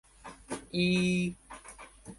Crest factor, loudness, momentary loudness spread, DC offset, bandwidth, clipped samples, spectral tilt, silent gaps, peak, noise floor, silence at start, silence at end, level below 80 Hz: 16 dB; -31 LUFS; 22 LU; under 0.1%; 11.5 kHz; under 0.1%; -5.5 dB/octave; none; -16 dBFS; -51 dBFS; 0.25 s; 0.05 s; -58 dBFS